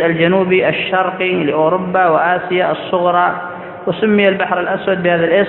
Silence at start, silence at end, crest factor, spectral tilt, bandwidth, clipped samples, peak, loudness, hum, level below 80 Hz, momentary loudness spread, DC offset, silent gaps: 0 s; 0 s; 14 dB; -10 dB/octave; 4.2 kHz; under 0.1%; 0 dBFS; -14 LUFS; none; -54 dBFS; 5 LU; under 0.1%; none